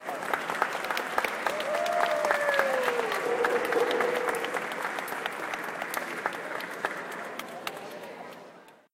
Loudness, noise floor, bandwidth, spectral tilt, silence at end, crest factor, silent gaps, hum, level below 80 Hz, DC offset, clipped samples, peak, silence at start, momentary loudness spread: -29 LUFS; -52 dBFS; 17 kHz; -2.5 dB/octave; 0.2 s; 24 dB; none; none; -74 dBFS; under 0.1%; under 0.1%; -6 dBFS; 0 s; 12 LU